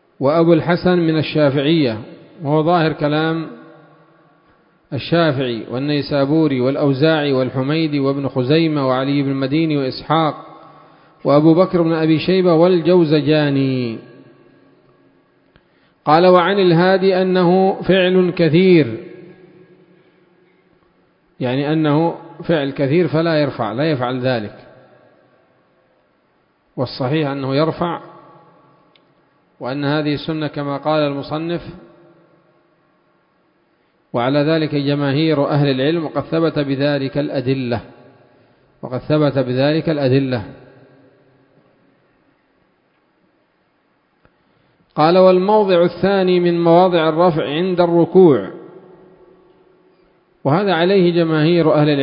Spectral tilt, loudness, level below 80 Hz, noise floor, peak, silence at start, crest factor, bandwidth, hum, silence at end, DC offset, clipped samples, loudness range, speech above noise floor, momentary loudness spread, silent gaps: -11 dB/octave; -16 LUFS; -54 dBFS; -61 dBFS; 0 dBFS; 0.2 s; 18 dB; 5.4 kHz; none; 0 s; under 0.1%; under 0.1%; 9 LU; 46 dB; 12 LU; none